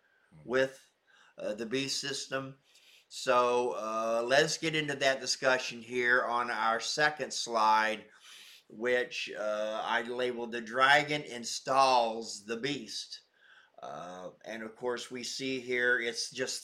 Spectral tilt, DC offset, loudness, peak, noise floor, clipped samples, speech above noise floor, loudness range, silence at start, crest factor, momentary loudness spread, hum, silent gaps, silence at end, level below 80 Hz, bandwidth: -2.5 dB/octave; under 0.1%; -31 LUFS; -12 dBFS; -62 dBFS; under 0.1%; 31 dB; 7 LU; 0.35 s; 20 dB; 17 LU; none; none; 0 s; -76 dBFS; 16 kHz